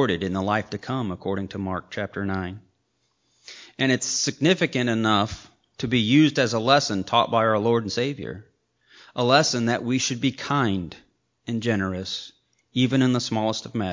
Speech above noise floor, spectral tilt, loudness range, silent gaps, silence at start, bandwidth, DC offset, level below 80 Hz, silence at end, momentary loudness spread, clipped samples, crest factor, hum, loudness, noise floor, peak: 48 dB; -4.5 dB/octave; 7 LU; none; 0 s; 7.6 kHz; under 0.1%; -52 dBFS; 0 s; 15 LU; under 0.1%; 20 dB; none; -23 LUFS; -71 dBFS; -4 dBFS